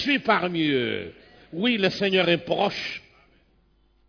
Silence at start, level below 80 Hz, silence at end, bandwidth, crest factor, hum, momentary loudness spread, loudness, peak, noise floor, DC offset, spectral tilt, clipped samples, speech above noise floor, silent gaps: 0 s; -62 dBFS; 1.1 s; 5.4 kHz; 20 dB; none; 13 LU; -23 LUFS; -6 dBFS; -62 dBFS; under 0.1%; -5.5 dB/octave; under 0.1%; 39 dB; none